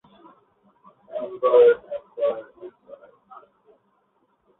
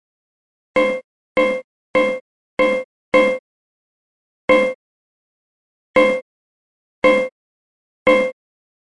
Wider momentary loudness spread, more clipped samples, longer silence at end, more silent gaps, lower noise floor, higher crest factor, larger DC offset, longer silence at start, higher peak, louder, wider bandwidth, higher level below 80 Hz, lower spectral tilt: first, 27 LU vs 12 LU; neither; first, 1.9 s vs 0.6 s; second, none vs 1.04-1.35 s, 1.64-1.94 s, 2.21-2.57 s, 2.84-3.12 s, 3.39-4.48 s, 4.75-5.94 s, 6.22-7.02 s, 7.32-8.06 s; second, -67 dBFS vs under -90 dBFS; about the same, 20 dB vs 20 dB; second, under 0.1% vs 0.3%; first, 1.1 s vs 0.75 s; second, -6 dBFS vs 0 dBFS; second, -21 LUFS vs -18 LUFS; second, 4 kHz vs 11 kHz; second, -70 dBFS vs -56 dBFS; first, -8 dB/octave vs -5 dB/octave